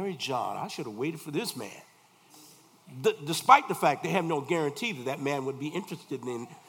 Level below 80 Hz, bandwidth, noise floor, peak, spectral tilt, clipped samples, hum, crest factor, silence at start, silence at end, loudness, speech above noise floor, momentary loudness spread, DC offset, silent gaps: -82 dBFS; 18 kHz; -58 dBFS; -4 dBFS; -4.5 dB/octave; under 0.1%; none; 26 dB; 0 s; 0.1 s; -29 LUFS; 29 dB; 16 LU; under 0.1%; none